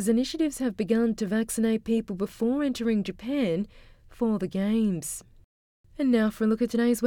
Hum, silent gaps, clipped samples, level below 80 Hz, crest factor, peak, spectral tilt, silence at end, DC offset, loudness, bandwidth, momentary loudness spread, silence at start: none; 5.44-5.84 s; under 0.1%; -54 dBFS; 14 dB; -12 dBFS; -5.5 dB/octave; 0 s; under 0.1%; -27 LUFS; 17 kHz; 6 LU; 0 s